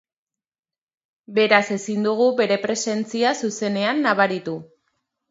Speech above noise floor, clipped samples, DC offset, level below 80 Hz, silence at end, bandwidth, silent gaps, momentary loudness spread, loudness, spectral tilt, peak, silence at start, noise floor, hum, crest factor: 53 dB; under 0.1%; under 0.1%; -72 dBFS; 0.65 s; 8 kHz; none; 8 LU; -20 LUFS; -4 dB/octave; 0 dBFS; 1.3 s; -74 dBFS; none; 22 dB